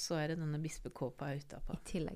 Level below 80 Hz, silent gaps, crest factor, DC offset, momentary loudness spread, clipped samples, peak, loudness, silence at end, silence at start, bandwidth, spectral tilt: -52 dBFS; none; 14 dB; under 0.1%; 9 LU; under 0.1%; -26 dBFS; -42 LUFS; 0 s; 0 s; 15.5 kHz; -5.5 dB/octave